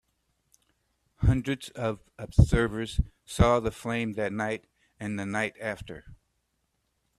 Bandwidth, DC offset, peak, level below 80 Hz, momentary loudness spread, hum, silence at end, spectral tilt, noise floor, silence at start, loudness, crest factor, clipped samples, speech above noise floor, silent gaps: 13.5 kHz; under 0.1%; -6 dBFS; -36 dBFS; 14 LU; none; 1.05 s; -6.5 dB/octave; -76 dBFS; 1.2 s; -28 LUFS; 24 dB; under 0.1%; 49 dB; none